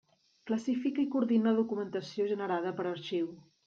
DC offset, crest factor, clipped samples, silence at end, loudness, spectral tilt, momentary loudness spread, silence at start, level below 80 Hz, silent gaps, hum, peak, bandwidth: under 0.1%; 16 dB; under 0.1%; 0.25 s; -32 LUFS; -6.5 dB/octave; 9 LU; 0.45 s; -80 dBFS; none; none; -18 dBFS; 7.6 kHz